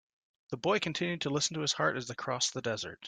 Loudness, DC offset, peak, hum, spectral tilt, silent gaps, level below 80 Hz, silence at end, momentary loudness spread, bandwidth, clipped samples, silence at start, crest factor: -32 LUFS; under 0.1%; -16 dBFS; none; -3 dB/octave; none; -72 dBFS; 0 s; 6 LU; 10.5 kHz; under 0.1%; 0.5 s; 18 dB